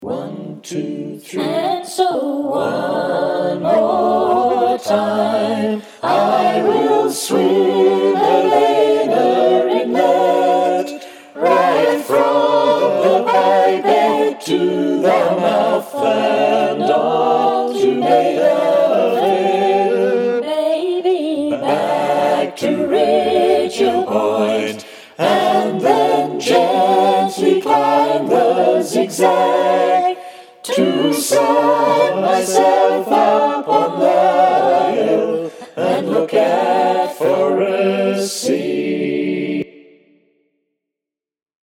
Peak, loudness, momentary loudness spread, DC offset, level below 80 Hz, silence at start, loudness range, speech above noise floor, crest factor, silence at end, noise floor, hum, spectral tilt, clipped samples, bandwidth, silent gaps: 0 dBFS; -15 LUFS; 7 LU; under 0.1%; -66 dBFS; 0 s; 3 LU; 68 dB; 14 dB; 1.95 s; -86 dBFS; none; -4.5 dB/octave; under 0.1%; 16.5 kHz; none